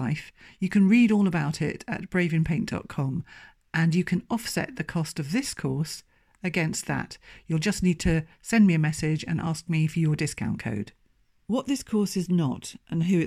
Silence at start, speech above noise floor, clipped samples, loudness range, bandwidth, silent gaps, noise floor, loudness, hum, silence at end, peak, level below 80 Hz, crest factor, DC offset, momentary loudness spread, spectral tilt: 0 s; 40 dB; under 0.1%; 4 LU; 15 kHz; none; -66 dBFS; -26 LUFS; none; 0 s; -10 dBFS; -48 dBFS; 16 dB; under 0.1%; 12 LU; -6 dB/octave